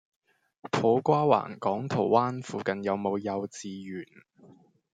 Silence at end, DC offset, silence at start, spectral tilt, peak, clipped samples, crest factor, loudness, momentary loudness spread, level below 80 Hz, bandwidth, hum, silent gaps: 0.4 s; under 0.1%; 0.65 s; -6.5 dB/octave; -8 dBFS; under 0.1%; 22 dB; -28 LUFS; 15 LU; -72 dBFS; 9.2 kHz; none; none